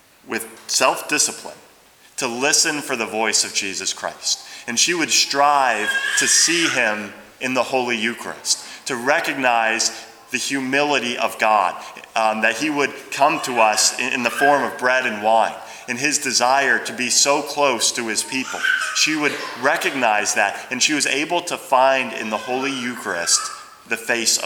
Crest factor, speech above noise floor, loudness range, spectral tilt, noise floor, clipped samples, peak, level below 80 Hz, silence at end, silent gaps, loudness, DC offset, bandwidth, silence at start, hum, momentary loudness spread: 20 dB; 31 dB; 3 LU; -0.5 dB/octave; -50 dBFS; under 0.1%; 0 dBFS; -70 dBFS; 0 s; none; -19 LUFS; under 0.1%; over 20 kHz; 0.25 s; none; 10 LU